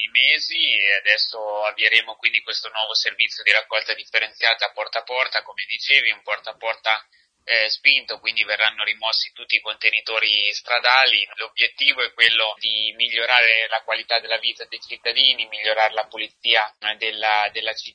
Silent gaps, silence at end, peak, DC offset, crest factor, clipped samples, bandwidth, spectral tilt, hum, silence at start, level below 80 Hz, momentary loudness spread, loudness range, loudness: none; 0.05 s; 0 dBFS; under 0.1%; 22 dB; under 0.1%; 10 kHz; 1.5 dB/octave; none; 0 s; -74 dBFS; 9 LU; 3 LU; -19 LUFS